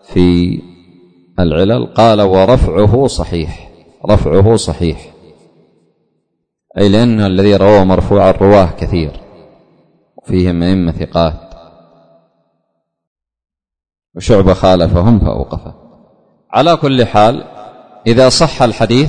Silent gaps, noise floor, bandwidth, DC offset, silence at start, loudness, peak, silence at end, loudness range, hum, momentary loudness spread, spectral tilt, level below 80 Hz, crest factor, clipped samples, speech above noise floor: 13.07-13.16 s; -69 dBFS; 9.6 kHz; under 0.1%; 0.1 s; -11 LUFS; 0 dBFS; 0 s; 7 LU; none; 14 LU; -6.5 dB/octave; -26 dBFS; 12 dB; 0.2%; 59 dB